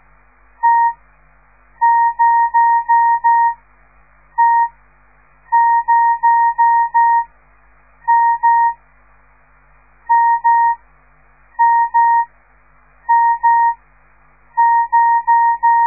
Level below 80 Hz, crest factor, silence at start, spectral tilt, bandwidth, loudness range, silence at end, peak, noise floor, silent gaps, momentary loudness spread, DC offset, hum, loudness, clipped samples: -54 dBFS; 10 dB; 0.65 s; -7 dB/octave; 2.5 kHz; 3 LU; 0 s; -4 dBFS; -51 dBFS; none; 6 LU; 0.2%; 50 Hz at -55 dBFS; -14 LUFS; under 0.1%